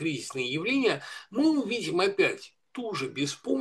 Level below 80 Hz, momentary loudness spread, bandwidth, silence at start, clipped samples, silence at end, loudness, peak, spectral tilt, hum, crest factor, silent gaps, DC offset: -78 dBFS; 10 LU; 12.5 kHz; 0 s; under 0.1%; 0 s; -28 LUFS; -10 dBFS; -4.5 dB/octave; none; 18 dB; none; under 0.1%